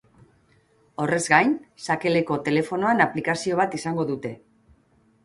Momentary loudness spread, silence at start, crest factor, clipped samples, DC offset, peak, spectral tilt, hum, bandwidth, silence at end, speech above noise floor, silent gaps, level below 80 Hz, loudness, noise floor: 11 LU; 1 s; 22 dB; under 0.1%; under 0.1%; -2 dBFS; -5 dB/octave; none; 11.5 kHz; 0.9 s; 38 dB; none; -64 dBFS; -23 LUFS; -61 dBFS